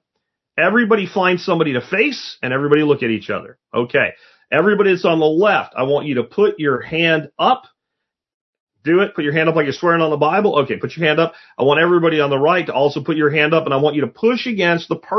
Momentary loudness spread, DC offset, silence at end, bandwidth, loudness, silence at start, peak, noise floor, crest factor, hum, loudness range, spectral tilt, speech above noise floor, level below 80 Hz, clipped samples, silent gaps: 7 LU; under 0.1%; 0 s; 6.2 kHz; -16 LUFS; 0.55 s; 0 dBFS; -80 dBFS; 16 dB; none; 3 LU; -6.5 dB/octave; 63 dB; -64 dBFS; under 0.1%; 8.34-8.53 s, 8.60-8.67 s